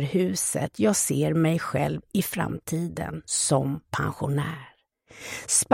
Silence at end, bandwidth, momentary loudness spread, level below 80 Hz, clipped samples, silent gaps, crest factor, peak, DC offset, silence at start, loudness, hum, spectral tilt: 0 s; 16.5 kHz; 11 LU; -54 dBFS; under 0.1%; none; 20 dB; -6 dBFS; under 0.1%; 0 s; -26 LUFS; none; -4.5 dB/octave